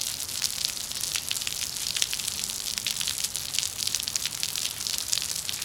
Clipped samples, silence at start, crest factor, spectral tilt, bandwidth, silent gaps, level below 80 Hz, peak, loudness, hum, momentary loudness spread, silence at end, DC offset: under 0.1%; 0 s; 30 dB; 1 dB/octave; 18 kHz; none; -58 dBFS; 0 dBFS; -27 LUFS; none; 3 LU; 0 s; under 0.1%